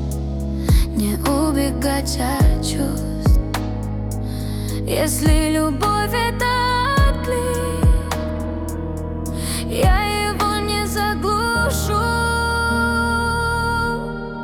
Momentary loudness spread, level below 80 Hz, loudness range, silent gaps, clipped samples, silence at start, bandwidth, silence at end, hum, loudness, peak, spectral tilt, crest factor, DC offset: 8 LU; -24 dBFS; 2 LU; none; under 0.1%; 0 s; 19 kHz; 0 s; none; -20 LUFS; -6 dBFS; -5 dB/octave; 14 dB; under 0.1%